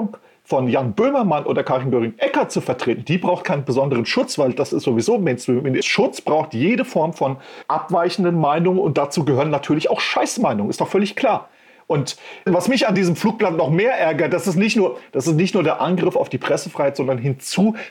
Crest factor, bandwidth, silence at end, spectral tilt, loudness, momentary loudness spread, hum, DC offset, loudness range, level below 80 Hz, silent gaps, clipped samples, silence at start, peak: 14 dB; 17 kHz; 0 s; -5.5 dB/octave; -19 LUFS; 5 LU; none; under 0.1%; 2 LU; -62 dBFS; none; under 0.1%; 0 s; -6 dBFS